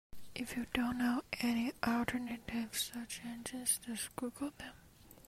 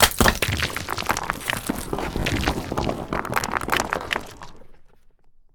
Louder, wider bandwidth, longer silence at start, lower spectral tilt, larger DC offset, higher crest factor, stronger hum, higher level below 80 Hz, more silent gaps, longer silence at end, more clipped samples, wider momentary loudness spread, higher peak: second, -38 LUFS vs -24 LUFS; second, 16 kHz vs over 20 kHz; about the same, 0.1 s vs 0 s; about the same, -2.5 dB/octave vs -3 dB/octave; neither; about the same, 22 dB vs 24 dB; neither; second, -62 dBFS vs -36 dBFS; neither; second, 0 s vs 0.25 s; neither; about the same, 9 LU vs 8 LU; second, -16 dBFS vs 0 dBFS